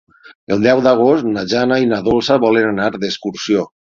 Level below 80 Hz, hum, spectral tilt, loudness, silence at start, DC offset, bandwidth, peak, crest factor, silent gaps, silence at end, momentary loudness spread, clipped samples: -48 dBFS; none; -5.5 dB/octave; -15 LUFS; 0.3 s; under 0.1%; 7.6 kHz; 0 dBFS; 16 dB; 0.35-0.47 s; 0.3 s; 8 LU; under 0.1%